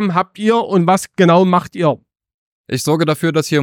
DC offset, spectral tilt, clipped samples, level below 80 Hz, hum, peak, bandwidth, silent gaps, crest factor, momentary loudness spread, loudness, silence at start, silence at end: under 0.1%; -6 dB/octave; under 0.1%; -60 dBFS; none; 0 dBFS; 17 kHz; 2.34-2.64 s; 14 dB; 7 LU; -15 LUFS; 0 s; 0 s